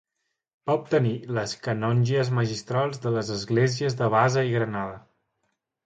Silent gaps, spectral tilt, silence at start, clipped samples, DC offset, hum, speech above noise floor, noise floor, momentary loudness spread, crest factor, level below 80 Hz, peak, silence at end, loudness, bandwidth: none; -6 dB/octave; 0.65 s; under 0.1%; under 0.1%; none; 56 dB; -80 dBFS; 8 LU; 20 dB; -60 dBFS; -6 dBFS; 0.85 s; -25 LUFS; 8.8 kHz